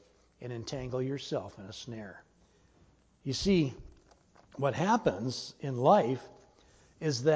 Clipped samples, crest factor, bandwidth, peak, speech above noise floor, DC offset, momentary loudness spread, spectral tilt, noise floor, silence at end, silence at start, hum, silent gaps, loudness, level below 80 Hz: under 0.1%; 22 dB; 8 kHz; -10 dBFS; 34 dB; under 0.1%; 19 LU; -6 dB/octave; -65 dBFS; 0 s; 0.4 s; none; none; -32 LUFS; -58 dBFS